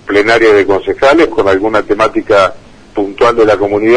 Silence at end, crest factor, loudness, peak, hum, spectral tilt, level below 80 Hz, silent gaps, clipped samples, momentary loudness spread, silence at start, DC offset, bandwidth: 0 s; 10 dB; -10 LUFS; 0 dBFS; none; -5 dB/octave; -36 dBFS; none; 0.2%; 6 LU; 0.05 s; under 0.1%; 10.5 kHz